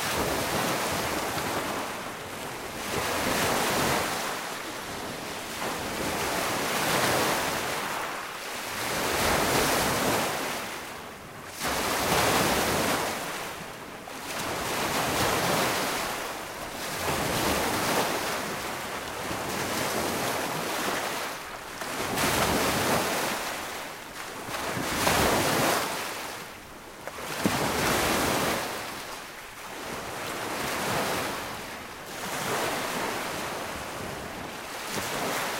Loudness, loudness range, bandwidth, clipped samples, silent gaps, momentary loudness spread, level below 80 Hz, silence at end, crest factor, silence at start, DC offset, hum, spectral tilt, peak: -28 LUFS; 4 LU; 16 kHz; under 0.1%; none; 12 LU; -50 dBFS; 0 s; 22 dB; 0 s; under 0.1%; none; -2.5 dB/octave; -8 dBFS